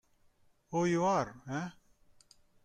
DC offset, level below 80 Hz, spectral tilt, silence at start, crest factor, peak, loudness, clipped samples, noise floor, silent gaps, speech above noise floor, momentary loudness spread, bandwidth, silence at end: under 0.1%; -68 dBFS; -6 dB/octave; 0.7 s; 18 dB; -18 dBFS; -33 LUFS; under 0.1%; -68 dBFS; none; 36 dB; 10 LU; 9.6 kHz; 0.95 s